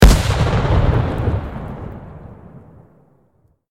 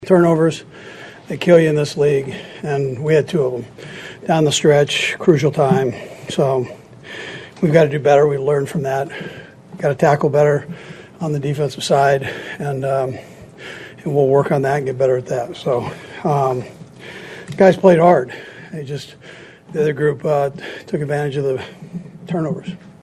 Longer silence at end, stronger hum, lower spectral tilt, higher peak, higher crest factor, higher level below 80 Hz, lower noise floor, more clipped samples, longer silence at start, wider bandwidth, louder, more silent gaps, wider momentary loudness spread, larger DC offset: first, 1.1 s vs 0.1 s; neither; about the same, -6 dB/octave vs -6 dB/octave; about the same, 0 dBFS vs 0 dBFS; about the same, 18 dB vs 18 dB; first, -20 dBFS vs -56 dBFS; first, -59 dBFS vs -36 dBFS; first, 0.1% vs under 0.1%; about the same, 0 s vs 0 s; first, 16 kHz vs 13 kHz; about the same, -18 LUFS vs -17 LUFS; neither; about the same, 22 LU vs 20 LU; neither